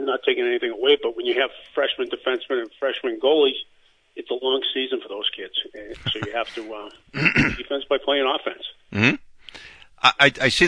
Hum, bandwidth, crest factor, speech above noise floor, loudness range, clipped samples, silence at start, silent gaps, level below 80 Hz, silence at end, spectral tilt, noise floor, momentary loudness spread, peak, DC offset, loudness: none; 10.5 kHz; 22 dB; 22 dB; 4 LU; under 0.1%; 0 s; none; -50 dBFS; 0 s; -4.5 dB/octave; -44 dBFS; 16 LU; 0 dBFS; under 0.1%; -22 LUFS